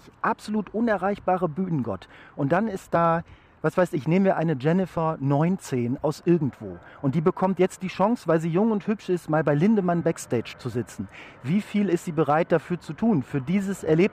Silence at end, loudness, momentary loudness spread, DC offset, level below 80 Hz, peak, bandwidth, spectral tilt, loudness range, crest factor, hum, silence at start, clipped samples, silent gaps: 0 s; -25 LUFS; 9 LU; under 0.1%; -58 dBFS; -10 dBFS; 14.5 kHz; -7.5 dB/octave; 2 LU; 14 dB; none; 0.25 s; under 0.1%; none